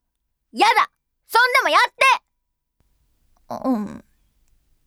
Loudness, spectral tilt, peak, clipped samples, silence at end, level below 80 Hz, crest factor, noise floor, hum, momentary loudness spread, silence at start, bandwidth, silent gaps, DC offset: -18 LUFS; -2.5 dB/octave; -4 dBFS; under 0.1%; 0.9 s; -62 dBFS; 18 dB; -75 dBFS; none; 16 LU; 0.55 s; 18.5 kHz; none; under 0.1%